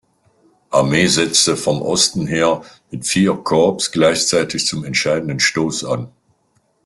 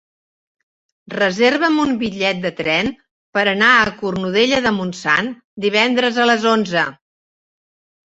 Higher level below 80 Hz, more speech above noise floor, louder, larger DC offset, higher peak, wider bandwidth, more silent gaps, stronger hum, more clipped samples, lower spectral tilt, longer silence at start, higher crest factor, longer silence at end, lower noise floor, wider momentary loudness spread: about the same, -52 dBFS vs -54 dBFS; second, 46 dB vs over 73 dB; about the same, -16 LUFS vs -16 LUFS; neither; about the same, -2 dBFS vs -2 dBFS; first, 12.5 kHz vs 8 kHz; second, none vs 3.11-3.33 s, 5.44-5.57 s; neither; neither; about the same, -3.5 dB/octave vs -4.5 dB/octave; second, 0.7 s vs 1.1 s; about the same, 16 dB vs 16 dB; second, 0.8 s vs 1.2 s; second, -62 dBFS vs under -90 dBFS; about the same, 9 LU vs 9 LU